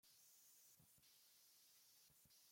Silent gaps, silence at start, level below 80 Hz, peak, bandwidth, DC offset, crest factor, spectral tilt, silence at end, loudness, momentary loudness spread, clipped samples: none; 0.05 s; under -90 dBFS; -58 dBFS; 16.5 kHz; under 0.1%; 14 dB; -0.5 dB/octave; 0 s; -69 LUFS; 2 LU; under 0.1%